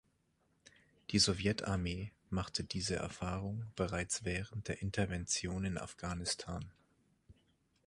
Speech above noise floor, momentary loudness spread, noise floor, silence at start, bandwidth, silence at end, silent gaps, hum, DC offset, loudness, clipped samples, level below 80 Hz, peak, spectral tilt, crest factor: 39 dB; 11 LU; -77 dBFS; 1.1 s; 11.5 kHz; 0.55 s; none; none; under 0.1%; -38 LUFS; under 0.1%; -54 dBFS; -16 dBFS; -4 dB/octave; 22 dB